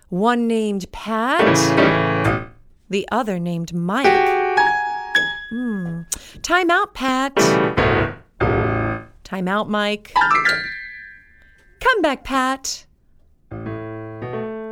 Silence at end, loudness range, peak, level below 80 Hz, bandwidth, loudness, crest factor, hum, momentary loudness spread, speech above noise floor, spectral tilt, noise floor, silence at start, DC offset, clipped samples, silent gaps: 0 s; 5 LU; -2 dBFS; -42 dBFS; over 20 kHz; -19 LUFS; 18 dB; none; 15 LU; 35 dB; -4.5 dB/octave; -53 dBFS; 0.1 s; under 0.1%; under 0.1%; none